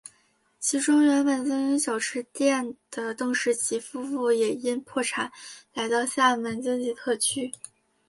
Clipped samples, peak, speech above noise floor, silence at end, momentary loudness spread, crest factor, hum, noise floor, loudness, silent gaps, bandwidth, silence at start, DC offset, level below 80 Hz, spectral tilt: under 0.1%; -10 dBFS; 40 dB; 0.6 s; 12 LU; 16 dB; none; -66 dBFS; -26 LUFS; none; 12 kHz; 0.6 s; under 0.1%; -74 dBFS; -2 dB/octave